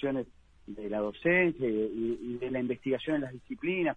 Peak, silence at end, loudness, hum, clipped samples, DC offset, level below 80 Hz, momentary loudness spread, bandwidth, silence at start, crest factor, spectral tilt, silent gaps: -14 dBFS; 0 s; -31 LUFS; none; under 0.1%; under 0.1%; -60 dBFS; 13 LU; 8.4 kHz; 0 s; 18 dB; -8 dB/octave; none